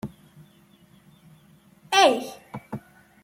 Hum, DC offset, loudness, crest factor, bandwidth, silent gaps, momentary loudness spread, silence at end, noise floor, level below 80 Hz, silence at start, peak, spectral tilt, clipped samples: none; under 0.1%; -20 LUFS; 22 dB; 16.5 kHz; none; 22 LU; 0.45 s; -56 dBFS; -64 dBFS; 0.05 s; -4 dBFS; -2.5 dB/octave; under 0.1%